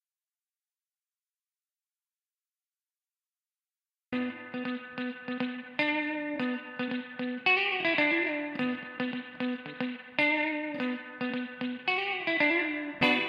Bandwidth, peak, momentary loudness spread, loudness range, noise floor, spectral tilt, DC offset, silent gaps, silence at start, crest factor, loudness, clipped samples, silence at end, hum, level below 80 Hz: 7.4 kHz; -10 dBFS; 11 LU; 11 LU; under -90 dBFS; -5.5 dB/octave; under 0.1%; none; 4.1 s; 22 dB; -30 LUFS; under 0.1%; 0 s; none; -76 dBFS